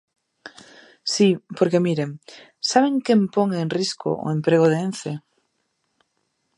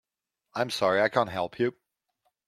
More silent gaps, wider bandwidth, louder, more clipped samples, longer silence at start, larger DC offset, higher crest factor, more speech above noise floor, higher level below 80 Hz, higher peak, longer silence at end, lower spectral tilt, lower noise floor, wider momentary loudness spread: neither; second, 11.5 kHz vs 15.5 kHz; first, -21 LUFS vs -27 LUFS; neither; about the same, 0.45 s vs 0.55 s; neither; about the same, 20 dB vs 22 dB; second, 52 dB vs 57 dB; about the same, -70 dBFS vs -70 dBFS; first, -2 dBFS vs -8 dBFS; first, 1.4 s vs 0.75 s; about the same, -5.5 dB/octave vs -4.5 dB/octave; second, -72 dBFS vs -84 dBFS; first, 13 LU vs 8 LU